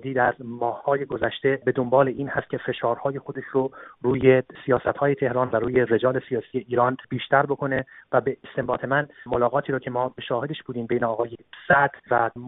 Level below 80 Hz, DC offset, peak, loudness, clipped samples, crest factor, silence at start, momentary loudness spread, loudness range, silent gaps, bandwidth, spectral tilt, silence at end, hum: -56 dBFS; under 0.1%; -4 dBFS; -24 LUFS; under 0.1%; 20 dB; 0 s; 9 LU; 3 LU; none; 4 kHz; -5 dB/octave; 0 s; none